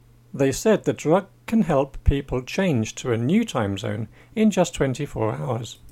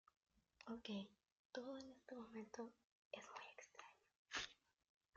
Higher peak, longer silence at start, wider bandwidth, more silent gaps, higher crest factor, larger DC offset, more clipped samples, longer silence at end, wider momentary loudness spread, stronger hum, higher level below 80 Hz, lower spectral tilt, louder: first, -4 dBFS vs -34 dBFS; second, 0.35 s vs 0.6 s; first, 16 kHz vs 8 kHz; second, none vs 1.32-1.50 s, 2.84-3.11 s, 4.16-4.25 s; second, 18 dB vs 24 dB; neither; neither; second, 0 s vs 0.65 s; second, 8 LU vs 12 LU; neither; first, -34 dBFS vs -84 dBFS; first, -6 dB/octave vs -2.5 dB/octave; first, -23 LUFS vs -55 LUFS